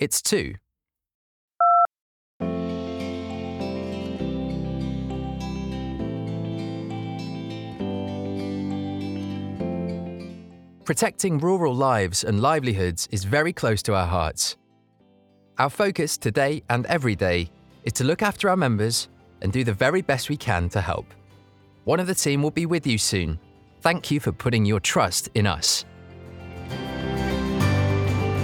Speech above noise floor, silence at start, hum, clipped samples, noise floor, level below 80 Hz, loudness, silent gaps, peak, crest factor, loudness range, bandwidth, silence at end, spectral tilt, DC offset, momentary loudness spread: 62 dB; 0 s; none; under 0.1%; -84 dBFS; -46 dBFS; -24 LUFS; 1.15-1.48 s, 2.01-2.40 s; -4 dBFS; 20 dB; 8 LU; 19.5 kHz; 0 s; -4.5 dB/octave; under 0.1%; 11 LU